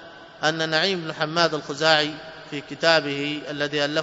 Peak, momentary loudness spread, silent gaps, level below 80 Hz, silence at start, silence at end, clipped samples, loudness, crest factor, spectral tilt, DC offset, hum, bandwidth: -2 dBFS; 12 LU; none; -66 dBFS; 0 s; 0 s; under 0.1%; -22 LUFS; 22 dB; -3.5 dB/octave; under 0.1%; none; 8 kHz